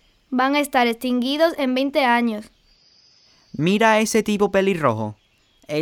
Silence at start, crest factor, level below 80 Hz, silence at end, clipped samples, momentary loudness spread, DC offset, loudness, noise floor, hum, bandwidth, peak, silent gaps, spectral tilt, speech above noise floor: 0.3 s; 16 dB; -58 dBFS; 0 s; under 0.1%; 11 LU; under 0.1%; -20 LUFS; -58 dBFS; none; 18.5 kHz; -4 dBFS; none; -4.5 dB/octave; 39 dB